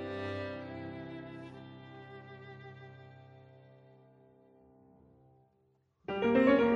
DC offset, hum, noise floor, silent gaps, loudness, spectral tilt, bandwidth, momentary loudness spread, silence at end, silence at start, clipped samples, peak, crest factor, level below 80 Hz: under 0.1%; none; -73 dBFS; none; -33 LUFS; -8 dB/octave; 6.6 kHz; 27 LU; 0 s; 0 s; under 0.1%; -14 dBFS; 22 dB; -68 dBFS